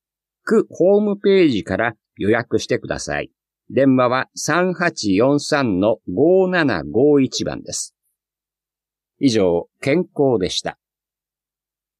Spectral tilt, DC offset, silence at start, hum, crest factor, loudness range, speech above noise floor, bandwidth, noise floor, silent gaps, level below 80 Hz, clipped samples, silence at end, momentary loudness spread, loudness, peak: -5 dB/octave; under 0.1%; 0.45 s; none; 16 dB; 4 LU; 72 dB; 13.5 kHz; -90 dBFS; none; -52 dBFS; under 0.1%; 1.25 s; 10 LU; -18 LUFS; -4 dBFS